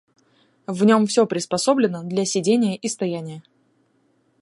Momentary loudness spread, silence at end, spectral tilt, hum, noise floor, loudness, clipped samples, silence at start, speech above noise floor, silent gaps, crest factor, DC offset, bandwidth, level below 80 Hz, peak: 15 LU; 1 s; -5 dB/octave; none; -64 dBFS; -20 LUFS; under 0.1%; 0.7 s; 44 dB; none; 18 dB; under 0.1%; 11.5 kHz; -68 dBFS; -4 dBFS